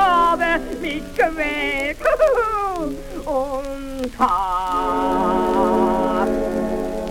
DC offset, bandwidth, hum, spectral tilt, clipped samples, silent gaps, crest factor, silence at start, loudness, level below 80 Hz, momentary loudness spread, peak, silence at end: under 0.1%; 17 kHz; none; -5 dB/octave; under 0.1%; none; 16 dB; 0 s; -20 LUFS; -36 dBFS; 9 LU; -4 dBFS; 0 s